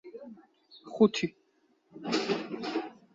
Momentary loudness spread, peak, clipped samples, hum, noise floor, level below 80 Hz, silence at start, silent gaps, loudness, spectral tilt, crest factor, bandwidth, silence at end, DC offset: 21 LU; -10 dBFS; under 0.1%; none; -70 dBFS; -74 dBFS; 0.05 s; none; -30 LUFS; -5 dB/octave; 22 dB; 7.8 kHz; 0.25 s; under 0.1%